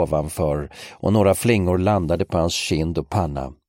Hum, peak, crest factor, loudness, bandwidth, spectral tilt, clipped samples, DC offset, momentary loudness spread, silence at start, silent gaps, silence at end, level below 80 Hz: none; -4 dBFS; 16 dB; -21 LUFS; 16.5 kHz; -6 dB/octave; under 0.1%; under 0.1%; 9 LU; 0 s; none; 0.15 s; -38 dBFS